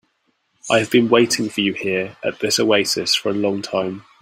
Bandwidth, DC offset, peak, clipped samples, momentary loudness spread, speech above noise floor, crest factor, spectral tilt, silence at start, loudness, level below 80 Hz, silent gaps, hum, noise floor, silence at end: 16 kHz; under 0.1%; -2 dBFS; under 0.1%; 8 LU; 48 dB; 18 dB; -3.5 dB/octave; 0.65 s; -18 LUFS; -62 dBFS; none; none; -67 dBFS; 0.2 s